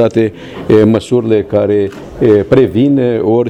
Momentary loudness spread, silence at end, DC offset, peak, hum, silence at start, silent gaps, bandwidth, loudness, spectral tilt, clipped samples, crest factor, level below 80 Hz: 6 LU; 0 s; under 0.1%; 0 dBFS; none; 0 s; none; 9.4 kHz; -11 LUFS; -8 dB/octave; under 0.1%; 10 dB; -40 dBFS